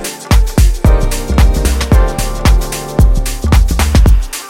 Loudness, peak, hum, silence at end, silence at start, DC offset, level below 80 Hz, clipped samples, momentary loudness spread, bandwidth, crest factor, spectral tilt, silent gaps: -12 LUFS; 0 dBFS; none; 0 s; 0 s; under 0.1%; -10 dBFS; under 0.1%; 4 LU; 16.5 kHz; 10 dB; -5.5 dB/octave; none